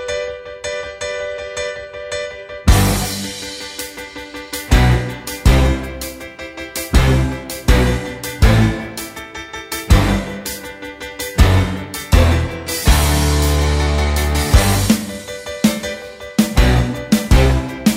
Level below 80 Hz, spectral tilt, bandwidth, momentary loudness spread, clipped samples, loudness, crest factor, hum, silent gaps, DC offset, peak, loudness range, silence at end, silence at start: -20 dBFS; -5 dB/octave; 16.5 kHz; 14 LU; under 0.1%; -17 LUFS; 16 dB; none; none; under 0.1%; 0 dBFS; 5 LU; 0 s; 0 s